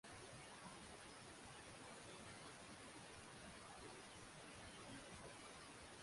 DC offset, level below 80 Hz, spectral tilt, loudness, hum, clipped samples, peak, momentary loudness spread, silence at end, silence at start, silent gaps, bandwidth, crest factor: under 0.1%; -74 dBFS; -3 dB/octave; -58 LUFS; none; under 0.1%; -44 dBFS; 1 LU; 0 s; 0.05 s; none; 11.5 kHz; 14 dB